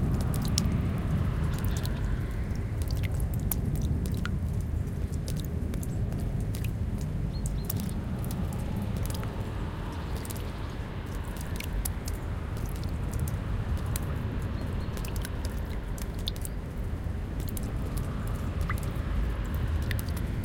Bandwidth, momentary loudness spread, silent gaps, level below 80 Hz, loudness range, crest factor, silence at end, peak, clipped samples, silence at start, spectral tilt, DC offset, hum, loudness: 17 kHz; 6 LU; none; -34 dBFS; 4 LU; 26 dB; 0 s; -4 dBFS; under 0.1%; 0 s; -6 dB/octave; under 0.1%; none; -33 LUFS